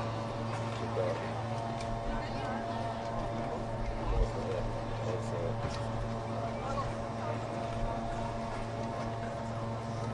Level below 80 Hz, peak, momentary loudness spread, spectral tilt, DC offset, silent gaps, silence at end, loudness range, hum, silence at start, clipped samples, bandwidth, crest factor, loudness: -44 dBFS; -18 dBFS; 3 LU; -6.5 dB/octave; under 0.1%; none; 0 s; 1 LU; none; 0 s; under 0.1%; 11 kHz; 18 dB; -36 LUFS